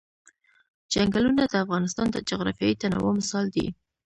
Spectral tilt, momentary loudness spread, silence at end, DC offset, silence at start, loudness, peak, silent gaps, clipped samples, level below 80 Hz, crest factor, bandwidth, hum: -5 dB/octave; 6 LU; 0.35 s; under 0.1%; 0.9 s; -25 LUFS; -10 dBFS; none; under 0.1%; -52 dBFS; 18 dB; 10.5 kHz; none